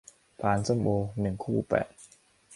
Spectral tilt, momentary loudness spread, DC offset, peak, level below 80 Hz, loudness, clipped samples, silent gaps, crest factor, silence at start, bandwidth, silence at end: -7 dB/octave; 6 LU; under 0.1%; -12 dBFS; -52 dBFS; -29 LUFS; under 0.1%; none; 18 dB; 0.4 s; 11.5 kHz; 0 s